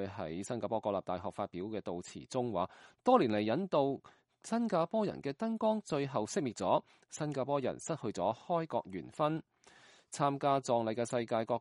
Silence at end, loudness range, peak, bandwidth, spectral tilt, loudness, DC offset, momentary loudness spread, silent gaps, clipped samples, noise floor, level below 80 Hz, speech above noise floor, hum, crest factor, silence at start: 0 s; 3 LU; -14 dBFS; 11.5 kHz; -6 dB/octave; -35 LUFS; under 0.1%; 10 LU; none; under 0.1%; -62 dBFS; -74 dBFS; 27 dB; none; 22 dB; 0 s